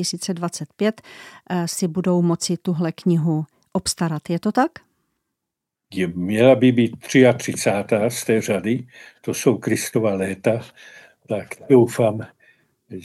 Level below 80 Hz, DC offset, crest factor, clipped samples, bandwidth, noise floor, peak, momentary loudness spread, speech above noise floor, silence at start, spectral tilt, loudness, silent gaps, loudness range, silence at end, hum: -60 dBFS; under 0.1%; 20 dB; under 0.1%; 15.5 kHz; -83 dBFS; -2 dBFS; 13 LU; 63 dB; 0 s; -5.5 dB/octave; -20 LUFS; none; 5 LU; 0 s; none